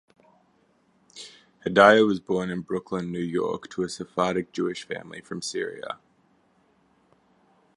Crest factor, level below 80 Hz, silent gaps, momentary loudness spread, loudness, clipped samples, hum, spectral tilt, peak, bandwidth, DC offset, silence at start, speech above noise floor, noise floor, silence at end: 26 dB; -64 dBFS; none; 21 LU; -25 LUFS; under 0.1%; none; -5 dB/octave; -2 dBFS; 11.5 kHz; under 0.1%; 1.15 s; 40 dB; -65 dBFS; 1.8 s